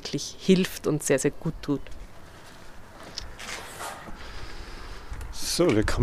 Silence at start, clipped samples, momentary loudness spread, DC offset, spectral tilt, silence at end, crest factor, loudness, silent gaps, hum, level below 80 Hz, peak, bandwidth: 0 s; under 0.1%; 24 LU; under 0.1%; -4.5 dB/octave; 0 s; 22 dB; -27 LUFS; none; none; -40 dBFS; -8 dBFS; 15.5 kHz